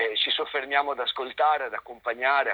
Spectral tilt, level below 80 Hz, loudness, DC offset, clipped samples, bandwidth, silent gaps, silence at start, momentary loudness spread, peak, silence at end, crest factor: -3 dB/octave; -70 dBFS; -26 LUFS; under 0.1%; under 0.1%; over 20 kHz; none; 0 s; 9 LU; -8 dBFS; 0 s; 18 dB